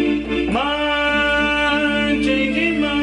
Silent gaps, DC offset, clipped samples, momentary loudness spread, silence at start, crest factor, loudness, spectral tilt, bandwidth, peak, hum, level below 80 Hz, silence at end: none; under 0.1%; under 0.1%; 3 LU; 0 s; 10 dB; -18 LUFS; -4.5 dB/octave; 10.5 kHz; -8 dBFS; none; -36 dBFS; 0 s